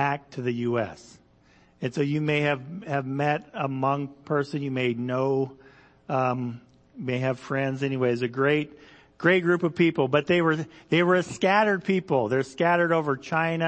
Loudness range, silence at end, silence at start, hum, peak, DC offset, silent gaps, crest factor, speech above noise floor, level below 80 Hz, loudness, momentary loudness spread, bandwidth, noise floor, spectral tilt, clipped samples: 5 LU; 0 s; 0 s; none; -6 dBFS; under 0.1%; none; 18 dB; 34 dB; -66 dBFS; -25 LUFS; 9 LU; 8.8 kHz; -59 dBFS; -6.5 dB/octave; under 0.1%